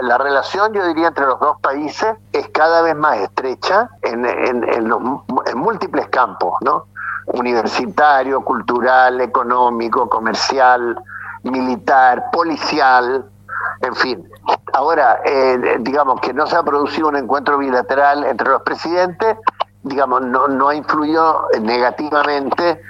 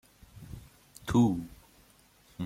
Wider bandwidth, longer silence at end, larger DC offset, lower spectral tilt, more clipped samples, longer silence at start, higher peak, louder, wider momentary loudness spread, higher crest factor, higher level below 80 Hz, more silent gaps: second, 8 kHz vs 16 kHz; about the same, 0 s vs 0 s; neither; second, -4.5 dB/octave vs -7 dB/octave; neither; second, 0 s vs 0.35 s; first, 0 dBFS vs -14 dBFS; first, -16 LUFS vs -28 LUFS; second, 8 LU vs 25 LU; second, 14 dB vs 20 dB; about the same, -58 dBFS vs -54 dBFS; neither